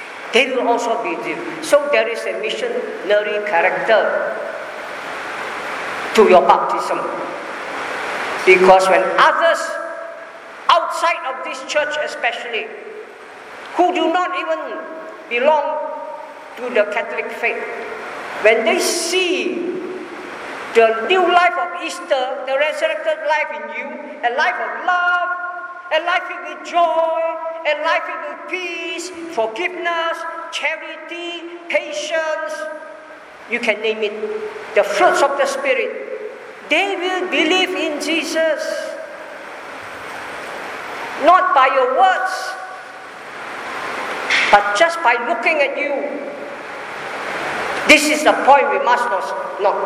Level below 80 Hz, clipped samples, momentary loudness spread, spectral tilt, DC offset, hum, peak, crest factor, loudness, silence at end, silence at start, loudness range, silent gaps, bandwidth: -62 dBFS; under 0.1%; 17 LU; -2.5 dB/octave; under 0.1%; none; 0 dBFS; 18 dB; -17 LUFS; 0 s; 0 s; 7 LU; none; 15 kHz